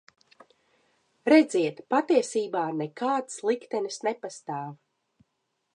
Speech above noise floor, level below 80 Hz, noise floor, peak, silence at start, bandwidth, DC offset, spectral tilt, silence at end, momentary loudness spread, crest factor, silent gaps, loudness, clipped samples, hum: 52 dB; -84 dBFS; -78 dBFS; -8 dBFS; 1.25 s; 11 kHz; under 0.1%; -4.5 dB/octave; 1 s; 15 LU; 20 dB; none; -27 LUFS; under 0.1%; none